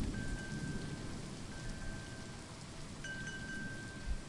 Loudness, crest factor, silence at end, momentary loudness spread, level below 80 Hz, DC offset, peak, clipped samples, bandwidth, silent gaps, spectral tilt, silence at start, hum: -45 LUFS; 16 dB; 0 s; 6 LU; -48 dBFS; under 0.1%; -28 dBFS; under 0.1%; 11.5 kHz; none; -4.5 dB/octave; 0 s; none